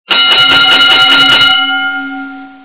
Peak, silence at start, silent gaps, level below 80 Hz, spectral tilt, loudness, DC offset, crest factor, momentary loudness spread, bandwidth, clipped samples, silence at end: 0 dBFS; 0.1 s; none; -48 dBFS; -5 dB/octave; -4 LUFS; 1%; 8 dB; 15 LU; 4 kHz; 2%; 0.15 s